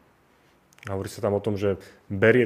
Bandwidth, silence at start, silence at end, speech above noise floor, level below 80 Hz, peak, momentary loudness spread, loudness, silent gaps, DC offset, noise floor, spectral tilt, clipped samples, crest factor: 15.5 kHz; 0.85 s; 0 s; 37 dB; -60 dBFS; -4 dBFS; 13 LU; -27 LUFS; none; under 0.1%; -60 dBFS; -7 dB/octave; under 0.1%; 20 dB